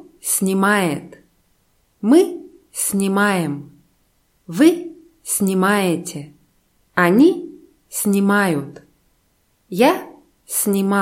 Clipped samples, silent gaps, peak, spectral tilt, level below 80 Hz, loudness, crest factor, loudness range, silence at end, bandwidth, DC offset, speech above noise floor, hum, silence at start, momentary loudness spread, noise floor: under 0.1%; none; 0 dBFS; -4.5 dB/octave; -64 dBFS; -18 LUFS; 18 dB; 2 LU; 0 s; 16.5 kHz; under 0.1%; 46 dB; none; 0.25 s; 16 LU; -63 dBFS